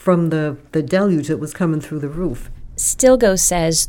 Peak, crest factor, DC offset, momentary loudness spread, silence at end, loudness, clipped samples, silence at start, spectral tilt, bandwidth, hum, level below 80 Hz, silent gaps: 0 dBFS; 16 dB; under 0.1%; 13 LU; 0 s; -17 LUFS; under 0.1%; 0.05 s; -4.5 dB/octave; 18.5 kHz; none; -36 dBFS; none